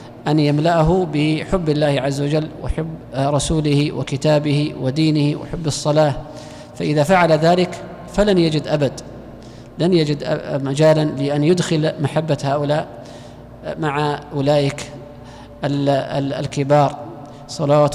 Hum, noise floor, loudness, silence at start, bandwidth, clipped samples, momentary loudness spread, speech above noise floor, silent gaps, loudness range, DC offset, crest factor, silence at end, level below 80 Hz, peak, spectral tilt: none; -37 dBFS; -18 LUFS; 0 s; 12.5 kHz; under 0.1%; 19 LU; 20 dB; none; 4 LU; under 0.1%; 12 dB; 0 s; -38 dBFS; -6 dBFS; -6.5 dB/octave